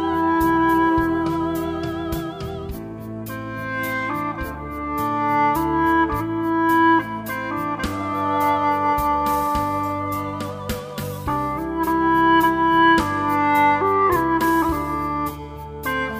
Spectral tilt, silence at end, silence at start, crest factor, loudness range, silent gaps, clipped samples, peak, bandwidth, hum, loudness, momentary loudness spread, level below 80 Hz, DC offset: -6 dB/octave; 0 s; 0 s; 16 dB; 8 LU; none; under 0.1%; -4 dBFS; 16 kHz; none; -20 LUFS; 13 LU; -40 dBFS; under 0.1%